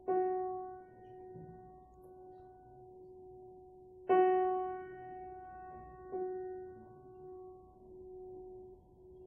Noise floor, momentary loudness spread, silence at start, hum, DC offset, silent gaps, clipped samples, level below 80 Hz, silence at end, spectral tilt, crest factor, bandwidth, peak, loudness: -58 dBFS; 24 LU; 0 s; none; under 0.1%; none; under 0.1%; -68 dBFS; 0 s; -2 dB/octave; 20 dB; 3.2 kHz; -20 dBFS; -37 LUFS